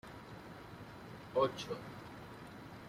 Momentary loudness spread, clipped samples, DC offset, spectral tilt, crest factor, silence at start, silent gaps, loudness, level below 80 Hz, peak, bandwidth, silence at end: 16 LU; under 0.1%; under 0.1%; -5.5 dB/octave; 22 dB; 0.05 s; none; -43 LUFS; -68 dBFS; -20 dBFS; 16 kHz; 0 s